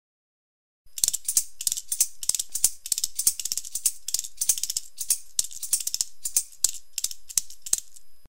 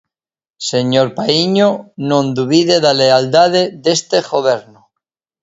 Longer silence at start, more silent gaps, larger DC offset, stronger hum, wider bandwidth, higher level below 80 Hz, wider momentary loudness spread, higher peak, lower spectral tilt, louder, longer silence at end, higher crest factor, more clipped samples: first, 0.85 s vs 0.6 s; neither; first, 1% vs under 0.1%; neither; first, 16.5 kHz vs 8 kHz; about the same, -60 dBFS vs -58 dBFS; about the same, 6 LU vs 7 LU; about the same, -2 dBFS vs 0 dBFS; second, 3 dB/octave vs -4.5 dB/octave; second, -25 LUFS vs -13 LUFS; second, 0 s vs 0.8 s; first, 28 dB vs 14 dB; neither